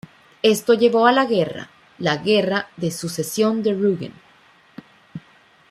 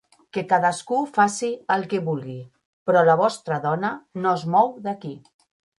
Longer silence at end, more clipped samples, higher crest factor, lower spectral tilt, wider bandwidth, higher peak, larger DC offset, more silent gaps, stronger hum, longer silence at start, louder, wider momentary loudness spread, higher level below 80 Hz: about the same, 0.5 s vs 0.6 s; neither; about the same, 20 dB vs 18 dB; about the same, -4.5 dB/octave vs -5.5 dB/octave; first, 14.5 kHz vs 11.5 kHz; about the same, -2 dBFS vs -4 dBFS; neither; second, none vs 2.65-2.86 s; neither; about the same, 0.45 s vs 0.35 s; first, -19 LUFS vs -22 LUFS; first, 23 LU vs 13 LU; first, -64 dBFS vs -70 dBFS